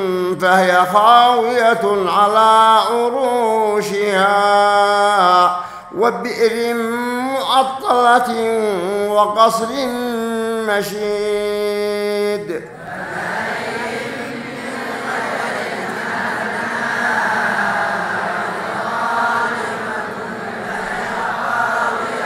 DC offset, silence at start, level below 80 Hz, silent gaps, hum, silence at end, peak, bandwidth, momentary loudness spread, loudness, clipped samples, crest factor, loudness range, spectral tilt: under 0.1%; 0 s; -58 dBFS; none; none; 0 s; 0 dBFS; 16 kHz; 12 LU; -16 LUFS; under 0.1%; 16 dB; 9 LU; -3.5 dB/octave